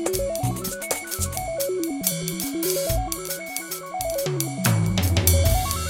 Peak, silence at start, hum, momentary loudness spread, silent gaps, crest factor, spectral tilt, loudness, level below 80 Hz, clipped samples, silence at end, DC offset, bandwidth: 0 dBFS; 0 s; none; 9 LU; none; 24 dB; -4.5 dB/octave; -24 LUFS; -34 dBFS; under 0.1%; 0 s; under 0.1%; 17 kHz